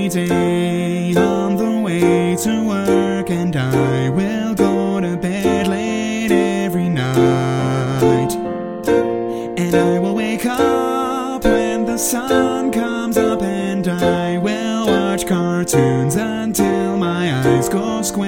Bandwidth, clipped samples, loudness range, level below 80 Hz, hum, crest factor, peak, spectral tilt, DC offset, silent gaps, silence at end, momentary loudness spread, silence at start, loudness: 17 kHz; under 0.1%; 1 LU; -42 dBFS; none; 16 dB; 0 dBFS; -5.5 dB/octave; under 0.1%; none; 0 s; 4 LU; 0 s; -17 LUFS